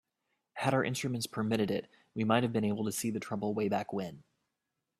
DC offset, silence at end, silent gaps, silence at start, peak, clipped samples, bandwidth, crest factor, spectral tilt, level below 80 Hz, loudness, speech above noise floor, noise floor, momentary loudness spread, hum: under 0.1%; 0.8 s; none; 0.55 s; -12 dBFS; under 0.1%; 15.5 kHz; 22 dB; -5.5 dB/octave; -70 dBFS; -33 LUFS; 54 dB; -86 dBFS; 9 LU; none